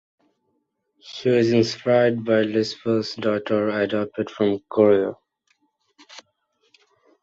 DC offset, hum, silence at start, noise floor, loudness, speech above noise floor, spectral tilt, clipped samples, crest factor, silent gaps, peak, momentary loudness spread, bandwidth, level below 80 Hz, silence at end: under 0.1%; none; 1.05 s; -72 dBFS; -21 LUFS; 52 dB; -6.5 dB/octave; under 0.1%; 20 dB; none; -4 dBFS; 8 LU; 7.8 kHz; -64 dBFS; 1 s